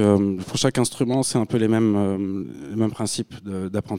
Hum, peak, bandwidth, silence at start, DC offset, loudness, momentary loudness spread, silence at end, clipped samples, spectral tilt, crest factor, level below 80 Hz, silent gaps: none; -4 dBFS; 16 kHz; 0 s; under 0.1%; -23 LUFS; 10 LU; 0 s; under 0.1%; -5.5 dB/octave; 18 dB; -56 dBFS; none